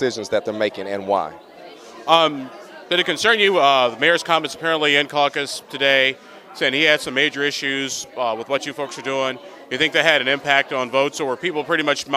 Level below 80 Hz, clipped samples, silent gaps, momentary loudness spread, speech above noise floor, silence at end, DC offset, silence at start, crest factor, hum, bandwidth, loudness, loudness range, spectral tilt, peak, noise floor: -66 dBFS; under 0.1%; none; 12 LU; 20 dB; 0 s; under 0.1%; 0 s; 20 dB; none; 15.5 kHz; -19 LUFS; 4 LU; -2.5 dB/octave; 0 dBFS; -40 dBFS